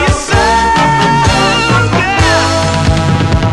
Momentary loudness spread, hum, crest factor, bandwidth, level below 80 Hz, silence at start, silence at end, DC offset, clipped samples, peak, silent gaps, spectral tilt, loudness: 2 LU; none; 10 dB; 12 kHz; -22 dBFS; 0 s; 0 s; under 0.1%; under 0.1%; 0 dBFS; none; -4.5 dB/octave; -10 LUFS